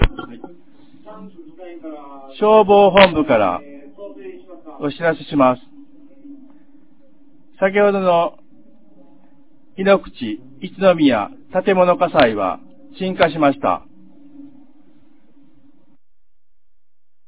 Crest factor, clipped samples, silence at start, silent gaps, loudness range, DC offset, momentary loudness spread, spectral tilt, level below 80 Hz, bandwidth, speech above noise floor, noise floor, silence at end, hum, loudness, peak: 20 dB; under 0.1%; 0 s; none; 7 LU; 0.9%; 25 LU; -9.5 dB/octave; -36 dBFS; 4 kHz; 63 dB; -79 dBFS; 2.8 s; none; -16 LUFS; 0 dBFS